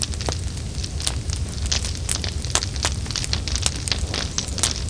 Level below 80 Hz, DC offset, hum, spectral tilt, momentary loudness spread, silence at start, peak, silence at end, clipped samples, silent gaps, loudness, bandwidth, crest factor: -30 dBFS; 0.4%; none; -2.5 dB/octave; 5 LU; 0 s; 0 dBFS; 0 s; under 0.1%; none; -24 LUFS; 10.5 kHz; 24 dB